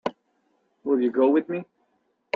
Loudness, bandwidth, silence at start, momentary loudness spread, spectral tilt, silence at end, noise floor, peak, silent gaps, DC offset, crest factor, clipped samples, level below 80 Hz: -24 LUFS; 6.2 kHz; 0.05 s; 14 LU; -7.5 dB/octave; 0.7 s; -71 dBFS; -8 dBFS; none; under 0.1%; 18 dB; under 0.1%; -76 dBFS